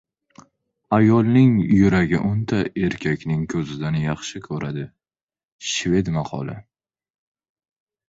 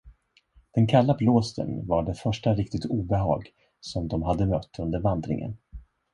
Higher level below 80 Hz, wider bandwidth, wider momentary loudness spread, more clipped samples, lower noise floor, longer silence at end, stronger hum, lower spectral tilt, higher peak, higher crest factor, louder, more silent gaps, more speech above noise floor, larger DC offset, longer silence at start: about the same, -46 dBFS vs -42 dBFS; second, 8 kHz vs 10.5 kHz; first, 14 LU vs 11 LU; neither; first, under -90 dBFS vs -61 dBFS; first, 1.5 s vs 0.35 s; neither; second, -6.5 dB/octave vs -8 dB/octave; about the same, -4 dBFS vs -6 dBFS; about the same, 18 dB vs 20 dB; first, -20 LUFS vs -26 LUFS; first, 5.23-5.27 s, 5.45-5.59 s vs none; first, over 70 dB vs 36 dB; neither; first, 0.9 s vs 0.05 s